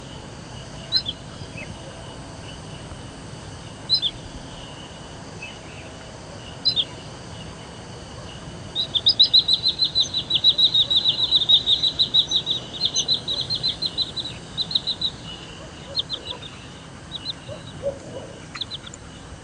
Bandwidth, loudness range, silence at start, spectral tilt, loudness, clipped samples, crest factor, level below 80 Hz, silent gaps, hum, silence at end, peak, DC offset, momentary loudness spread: 10.5 kHz; 14 LU; 0 s; -2 dB/octave; -19 LUFS; under 0.1%; 20 dB; -48 dBFS; none; none; 0 s; -4 dBFS; under 0.1%; 23 LU